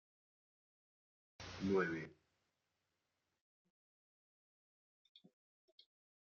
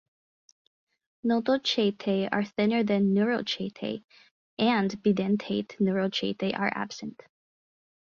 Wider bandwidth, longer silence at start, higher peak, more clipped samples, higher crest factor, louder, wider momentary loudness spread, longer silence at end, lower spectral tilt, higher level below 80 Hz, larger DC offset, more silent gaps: about the same, 7 kHz vs 7.2 kHz; first, 1.4 s vs 1.25 s; second, -26 dBFS vs -10 dBFS; neither; first, 24 dB vs 18 dB; second, -41 LUFS vs -27 LUFS; first, 18 LU vs 11 LU; first, 4.1 s vs 0.9 s; about the same, -5 dB/octave vs -6 dB/octave; second, -78 dBFS vs -68 dBFS; neither; second, none vs 4.04-4.08 s, 4.31-4.57 s